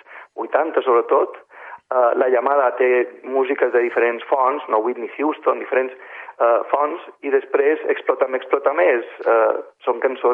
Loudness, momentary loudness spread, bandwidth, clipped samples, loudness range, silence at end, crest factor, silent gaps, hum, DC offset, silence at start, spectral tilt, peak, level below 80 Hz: -19 LUFS; 9 LU; 3.8 kHz; under 0.1%; 2 LU; 0 s; 16 dB; none; none; under 0.1%; 0.1 s; -6 dB/octave; -2 dBFS; -82 dBFS